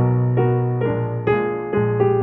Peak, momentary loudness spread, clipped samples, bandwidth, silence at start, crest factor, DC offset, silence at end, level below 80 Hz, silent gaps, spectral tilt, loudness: -6 dBFS; 4 LU; under 0.1%; 3.6 kHz; 0 s; 12 dB; under 0.1%; 0 s; -48 dBFS; none; -12 dB/octave; -20 LUFS